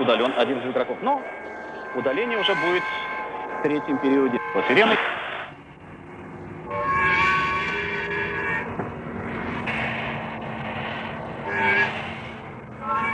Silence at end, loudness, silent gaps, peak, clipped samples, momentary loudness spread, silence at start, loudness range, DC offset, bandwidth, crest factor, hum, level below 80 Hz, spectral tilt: 0 s; -24 LUFS; none; -6 dBFS; under 0.1%; 16 LU; 0 s; 5 LU; under 0.1%; 9.8 kHz; 20 dB; none; -52 dBFS; -5.5 dB/octave